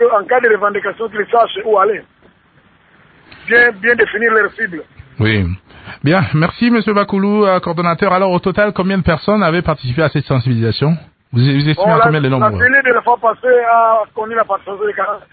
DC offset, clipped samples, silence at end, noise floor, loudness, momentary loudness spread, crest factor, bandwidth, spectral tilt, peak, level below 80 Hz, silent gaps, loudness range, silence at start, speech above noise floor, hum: under 0.1%; under 0.1%; 0.15 s; -50 dBFS; -13 LUFS; 9 LU; 14 dB; 4.8 kHz; -11 dB/octave; 0 dBFS; -38 dBFS; none; 3 LU; 0 s; 37 dB; none